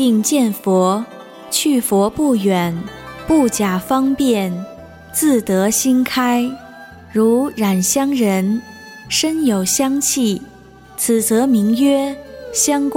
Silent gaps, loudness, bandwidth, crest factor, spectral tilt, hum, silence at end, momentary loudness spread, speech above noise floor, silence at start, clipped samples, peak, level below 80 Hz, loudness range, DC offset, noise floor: none; -16 LUFS; 17 kHz; 12 dB; -4 dB/octave; none; 0 s; 12 LU; 22 dB; 0 s; under 0.1%; -4 dBFS; -48 dBFS; 1 LU; under 0.1%; -38 dBFS